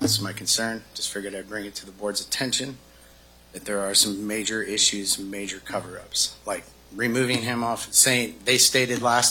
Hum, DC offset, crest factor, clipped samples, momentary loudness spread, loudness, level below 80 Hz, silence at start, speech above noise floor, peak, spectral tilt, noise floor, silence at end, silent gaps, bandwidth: none; under 0.1%; 24 dB; under 0.1%; 15 LU; -23 LUFS; -56 dBFS; 0 s; 27 dB; -2 dBFS; -1.5 dB/octave; -52 dBFS; 0 s; none; 17.5 kHz